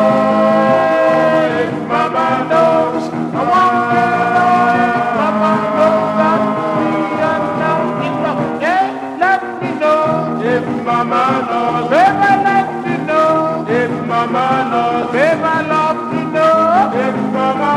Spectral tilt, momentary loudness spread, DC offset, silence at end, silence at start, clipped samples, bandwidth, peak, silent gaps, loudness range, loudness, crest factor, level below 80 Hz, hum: -6.5 dB/octave; 5 LU; under 0.1%; 0 s; 0 s; under 0.1%; 11.5 kHz; 0 dBFS; none; 3 LU; -14 LUFS; 14 dB; -58 dBFS; none